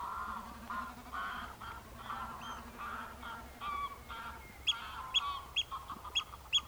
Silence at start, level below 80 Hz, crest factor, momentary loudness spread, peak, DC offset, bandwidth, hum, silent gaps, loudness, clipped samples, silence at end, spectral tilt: 0 s; -56 dBFS; 20 dB; 12 LU; -20 dBFS; under 0.1%; over 20 kHz; none; none; -39 LUFS; under 0.1%; 0 s; -1.5 dB/octave